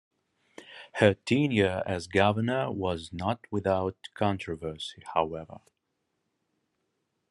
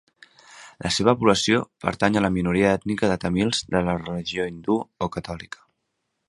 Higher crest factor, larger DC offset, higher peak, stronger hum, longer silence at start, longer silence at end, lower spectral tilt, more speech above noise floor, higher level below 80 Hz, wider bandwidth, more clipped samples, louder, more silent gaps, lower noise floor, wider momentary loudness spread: about the same, 24 dB vs 22 dB; neither; second, -6 dBFS vs -2 dBFS; neither; about the same, 0.6 s vs 0.5 s; first, 1.75 s vs 0.85 s; first, -6.5 dB/octave vs -5 dB/octave; about the same, 51 dB vs 54 dB; second, -64 dBFS vs -48 dBFS; about the same, 11.5 kHz vs 11.5 kHz; neither; second, -29 LUFS vs -23 LUFS; neither; about the same, -80 dBFS vs -77 dBFS; about the same, 14 LU vs 13 LU